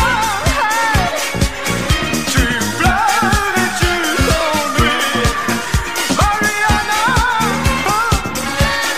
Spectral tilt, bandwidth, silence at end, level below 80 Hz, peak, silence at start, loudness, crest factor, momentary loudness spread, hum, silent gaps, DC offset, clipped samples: -3.5 dB/octave; 15.5 kHz; 0 s; -24 dBFS; -2 dBFS; 0 s; -15 LUFS; 14 dB; 4 LU; none; none; 2%; under 0.1%